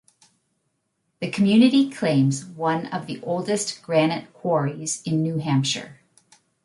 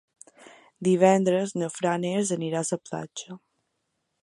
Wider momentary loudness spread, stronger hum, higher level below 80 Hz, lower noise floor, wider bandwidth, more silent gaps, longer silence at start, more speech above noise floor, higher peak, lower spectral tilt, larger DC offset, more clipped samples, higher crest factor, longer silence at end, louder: second, 12 LU vs 18 LU; neither; first, -68 dBFS vs -74 dBFS; second, -74 dBFS vs -78 dBFS; about the same, 11.5 kHz vs 11.5 kHz; neither; first, 1.2 s vs 0.8 s; about the same, 52 dB vs 53 dB; about the same, -4 dBFS vs -6 dBFS; about the same, -5.5 dB/octave vs -5.5 dB/octave; neither; neither; about the same, 18 dB vs 22 dB; second, 0.7 s vs 0.85 s; first, -22 LUFS vs -25 LUFS